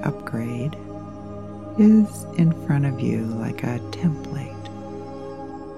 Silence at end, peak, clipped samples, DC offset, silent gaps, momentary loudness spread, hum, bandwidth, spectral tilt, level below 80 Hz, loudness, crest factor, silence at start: 0 s; -6 dBFS; under 0.1%; 0.4%; none; 18 LU; none; 12.5 kHz; -8 dB/octave; -52 dBFS; -22 LUFS; 18 dB; 0 s